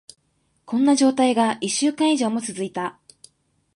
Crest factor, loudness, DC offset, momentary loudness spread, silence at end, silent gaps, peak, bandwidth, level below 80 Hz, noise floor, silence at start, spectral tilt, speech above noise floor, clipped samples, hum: 16 dB; -21 LUFS; under 0.1%; 11 LU; 0.85 s; none; -6 dBFS; 11.5 kHz; -72 dBFS; -67 dBFS; 0.7 s; -3.5 dB/octave; 47 dB; under 0.1%; none